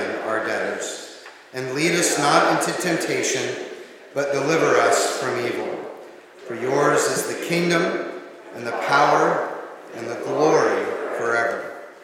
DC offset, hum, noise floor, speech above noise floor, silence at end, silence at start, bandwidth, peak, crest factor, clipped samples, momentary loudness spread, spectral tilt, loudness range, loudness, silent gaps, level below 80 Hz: under 0.1%; none; -42 dBFS; 22 dB; 0 s; 0 s; 17 kHz; -2 dBFS; 20 dB; under 0.1%; 18 LU; -3.5 dB/octave; 2 LU; -21 LUFS; none; -78 dBFS